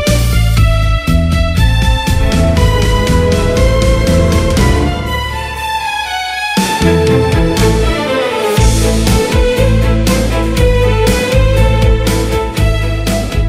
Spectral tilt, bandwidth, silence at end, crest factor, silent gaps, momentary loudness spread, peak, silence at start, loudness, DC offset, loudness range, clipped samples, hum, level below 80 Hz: -5.5 dB/octave; 16 kHz; 0 s; 10 dB; none; 5 LU; 0 dBFS; 0 s; -12 LUFS; under 0.1%; 2 LU; under 0.1%; none; -14 dBFS